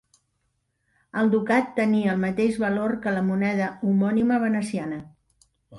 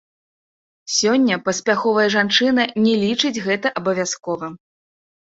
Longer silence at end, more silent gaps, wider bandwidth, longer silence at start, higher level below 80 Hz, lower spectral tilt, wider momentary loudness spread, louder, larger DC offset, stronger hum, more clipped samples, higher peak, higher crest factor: second, 0 s vs 0.75 s; neither; first, 11.5 kHz vs 8 kHz; first, 1.15 s vs 0.85 s; about the same, -60 dBFS vs -64 dBFS; first, -7.5 dB/octave vs -3 dB/octave; second, 7 LU vs 10 LU; second, -24 LUFS vs -18 LUFS; neither; neither; neither; second, -8 dBFS vs -2 dBFS; about the same, 16 dB vs 18 dB